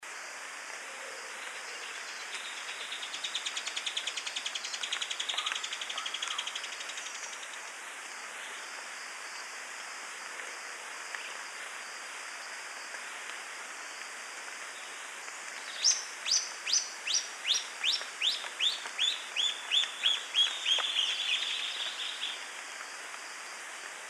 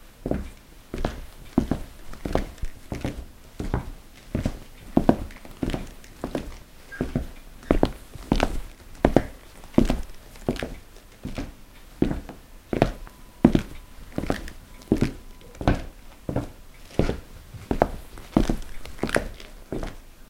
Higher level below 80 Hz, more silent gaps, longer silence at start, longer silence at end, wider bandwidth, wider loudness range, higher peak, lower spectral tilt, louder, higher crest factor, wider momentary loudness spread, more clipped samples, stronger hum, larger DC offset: second, under -90 dBFS vs -34 dBFS; neither; about the same, 0 s vs 0 s; about the same, 0 s vs 0.05 s; second, 14.5 kHz vs 16.5 kHz; first, 12 LU vs 5 LU; second, -14 dBFS vs 0 dBFS; second, 4 dB/octave vs -6.5 dB/octave; second, -33 LUFS vs -28 LUFS; second, 22 dB vs 28 dB; second, 13 LU vs 21 LU; neither; neither; neither